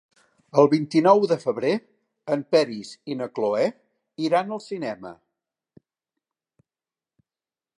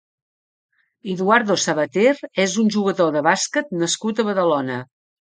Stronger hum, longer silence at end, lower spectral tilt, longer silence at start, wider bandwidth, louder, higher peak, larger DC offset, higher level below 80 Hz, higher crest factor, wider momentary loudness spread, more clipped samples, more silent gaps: neither; first, 2.65 s vs 0.45 s; first, -6.5 dB/octave vs -4 dB/octave; second, 0.55 s vs 1.05 s; first, 11 kHz vs 9.6 kHz; second, -23 LUFS vs -19 LUFS; second, -4 dBFS vs 0 dBFS; neither; second, -78 dBFS vs -68 dBFS; about the same, 22 dB vs 20 dB; first, 15 LU vs 7 LU; neither; neither